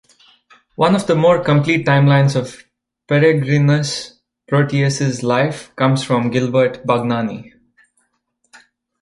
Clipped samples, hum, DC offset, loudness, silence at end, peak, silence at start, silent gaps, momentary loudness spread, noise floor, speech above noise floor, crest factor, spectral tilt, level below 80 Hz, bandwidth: under 0.1%; none; under 0.1%; -16 LUFS; 1.55 s; -2 dBFS; 0.8 s; none; 10 LU; -67 dBFS; 52 dB; 16 dB; -6.5 dB/octave; -54 dBFS; 11.5 kHz